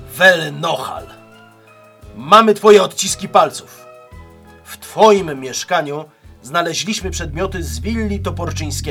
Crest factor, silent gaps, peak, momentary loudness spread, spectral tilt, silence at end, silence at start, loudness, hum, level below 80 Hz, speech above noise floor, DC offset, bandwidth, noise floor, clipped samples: 16 dB; none; 0 dBFS; 18 LU; -3.5 dB/octave; 0 s; 0 s; -15 LUFS; none; -36 dBFS; 30 dB; under 0.1%; 18 kHz; -45 dBFS; 0.2%